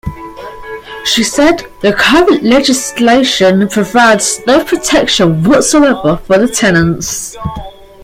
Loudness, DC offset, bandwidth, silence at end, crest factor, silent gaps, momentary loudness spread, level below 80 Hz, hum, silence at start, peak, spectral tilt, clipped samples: -9 LUFS; under 0.1%; 16.5 kHz; 0 s; 10 dB; none; 16 LU; -34 dBFS; none; 0.05 s; 0 dBFS; -4 dB/octave; under 0.1%